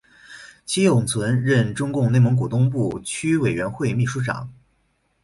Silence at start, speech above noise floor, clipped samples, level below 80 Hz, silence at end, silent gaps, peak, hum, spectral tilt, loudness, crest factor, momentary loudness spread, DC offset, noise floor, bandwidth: 0.3 s; 47 dB; under 0.1%; -52 dBFS; 0.7 s; none; -6 dBFS; none; -6 dB/octave; -21 LUFS; 16 dB; 12 LU; under 0.1%; -67 dBFS; 11.5 kHz